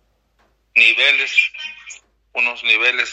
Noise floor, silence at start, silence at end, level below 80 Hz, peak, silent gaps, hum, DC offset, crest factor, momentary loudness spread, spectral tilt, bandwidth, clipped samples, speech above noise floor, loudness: -61 dBFS; 0.75 s; 0 s; -64 dBFS; 0 dBFS; none; none; under 0.1%; 18 dB; 19 LU; 1.5 dB/octave; 9.2 kHz; under 0.1%; 44 dB; -14 LUFS